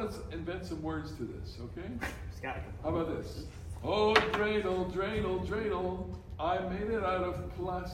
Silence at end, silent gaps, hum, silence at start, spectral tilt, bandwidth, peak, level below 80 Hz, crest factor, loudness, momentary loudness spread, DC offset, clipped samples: 0 s; none; none; 0 s; -6 dB/octave; 16.5 kHz; -8 dBFS; -48 dBFS; 26 dB; -34 LUFS; 12 LU; under 0.1%; under 0.1%